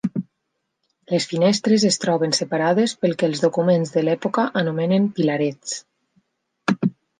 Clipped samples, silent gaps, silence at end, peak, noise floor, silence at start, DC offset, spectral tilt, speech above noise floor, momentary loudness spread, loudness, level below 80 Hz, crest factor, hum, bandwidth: under 0.1%; none; 0.3 s; -4 dBFS; -76 dBFS; 0.05 s; under 0.1%; -5 dB/octave; 56 dB; 8 LU; -20 LUFS; -68 dBFS; 18 dB; none; 10 kHz